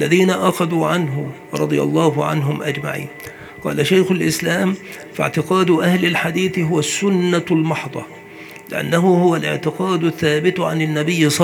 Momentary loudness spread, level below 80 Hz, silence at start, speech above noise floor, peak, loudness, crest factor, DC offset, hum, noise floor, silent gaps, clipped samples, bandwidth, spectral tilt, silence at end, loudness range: 13 LU; -60 dBFS; 0 s; 20 dB; 0 dBFS; -18 LUFS; 18 dB; under 0.1%; none; -37 dBFS; none; under 0.1%; 19.5 kHz; -5.5 dB/octave; 0 s; 2 LU